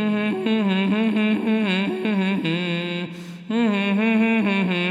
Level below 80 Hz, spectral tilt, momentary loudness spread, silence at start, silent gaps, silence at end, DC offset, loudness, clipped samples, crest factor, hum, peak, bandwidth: -72 dBFS; -7 dB/octave; 7 LU; 0 s; none; 0 s; under 0.1%; -21 LUFS; under 0.1%; 12 dB; none; -8 dBFS; 9.8 kHz